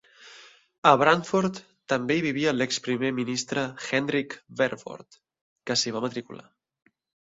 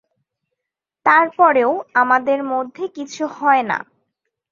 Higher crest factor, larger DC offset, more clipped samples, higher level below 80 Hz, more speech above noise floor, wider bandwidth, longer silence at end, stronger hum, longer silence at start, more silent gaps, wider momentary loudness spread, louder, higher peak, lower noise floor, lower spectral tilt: first, 26 dB vs 18 dB; neither; neither; about the same, -68 dBFS vs -70 dBFS; second, 26 dB vs 67 dB; about the same, 8 kHz vs 7.6 kHz; first, 0.95 s vs 0.7 s; neither; second, 0.2 s vs 1.05 s; first, 0.78-0.82 s, 5.41-5.56 s vs none; first, 20 LU vs 12 LU; second, -25 LUFS vs -17 LUFS; about the same, -2 dBFS vs 0 dBFS; second, -52 dBFS vs -84 dBFS; about the same, -4 dB/octave vs -4.5 dB/octave